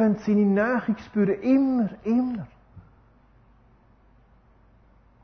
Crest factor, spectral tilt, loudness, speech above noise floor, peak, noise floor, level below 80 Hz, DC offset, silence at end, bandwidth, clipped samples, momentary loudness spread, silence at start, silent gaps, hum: 14 dB; -9.5 dB/octave; -24 LUFS; 35 dB; -12 dBFS; -57 dBFS; -58 dBFS; under 0.1%; 2.45 s; 6.4 kHz; under 0.1%; 8 LU; 0 s; none; none